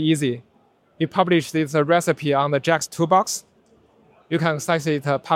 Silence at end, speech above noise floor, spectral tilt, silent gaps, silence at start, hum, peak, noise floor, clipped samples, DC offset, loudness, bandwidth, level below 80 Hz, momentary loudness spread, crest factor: 0 s; 39 dB; -5 dB/octave; none; 0 s; none; -2 dBFS; -59 dBFS; under 0.1%; under 0.1%; -21 LUFS; 16.5 kHz; -66 dBFS; 8 LU; 18 dB